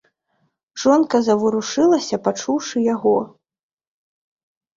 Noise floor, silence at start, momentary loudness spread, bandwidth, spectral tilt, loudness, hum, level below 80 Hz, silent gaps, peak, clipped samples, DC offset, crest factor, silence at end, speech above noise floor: -68 dBFS; 0.75 s; 6 LU; 7.6 kHz; -4.5 dB/octave; -18 LUFS; none; -64 dBFS; none; -2 dBFS; under 0.1%; under 0.1%; 18 dB; 1.5 s; 51 dB